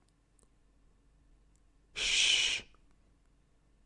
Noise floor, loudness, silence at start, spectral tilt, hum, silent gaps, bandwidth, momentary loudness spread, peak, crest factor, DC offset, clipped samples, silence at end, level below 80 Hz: -68 dBFS; -28 LUFS; 1.95 s; 2 dB/octave; none; none; 11.5 kHz; 13 LU; -14 dBFS; 24 dB; under 0.1%; under 0.1%; 1.25 s; -62 dBFS